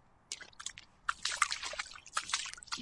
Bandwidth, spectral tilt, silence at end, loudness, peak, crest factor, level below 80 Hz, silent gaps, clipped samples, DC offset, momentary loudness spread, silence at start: 11.5 kHz; 1.5 dB/octave; 0 s; -38 LUFS; -12 dBFS; 28 dB; -68 dBFS; none; under 0.1%; under 0.1%; 12 LU; 0.3 s